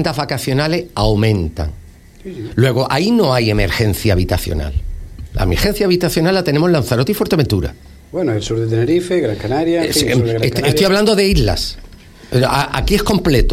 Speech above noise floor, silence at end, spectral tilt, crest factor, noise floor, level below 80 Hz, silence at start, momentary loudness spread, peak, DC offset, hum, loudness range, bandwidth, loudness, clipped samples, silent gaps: 23 dB; 0 s; -5.5 dB/octave; 14 dB; -38 dBFS; -26 dBFS; 0 s; 11 LU; 0 dBFS; under 0.1%; none; 2 LU; 16.5 kHz; -15 LUFS; under 0.1%; none